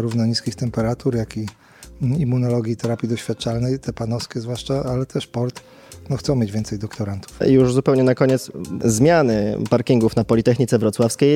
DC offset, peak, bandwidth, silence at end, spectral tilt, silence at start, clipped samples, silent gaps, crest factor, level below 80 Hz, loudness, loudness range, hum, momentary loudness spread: under 0.1%; -2 dBFS; 15.5 kHz; 0 s; -6.5 dB/octave; 0 s; under 0.1%; none; 18 dB; -44 dBFS; -20 LUFS; 7 LU; none; 11 LU